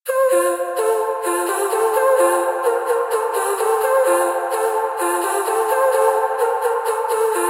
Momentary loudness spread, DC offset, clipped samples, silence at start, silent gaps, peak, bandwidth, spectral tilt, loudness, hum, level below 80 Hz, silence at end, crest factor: 4 LU; under 0.1%; under 0.1%; 0.05 s; none; -4 dBFS; 16 kHz; 0.5 dB/octave; -18 LUFS; none; -90 dBFS; 0 s; 14 dB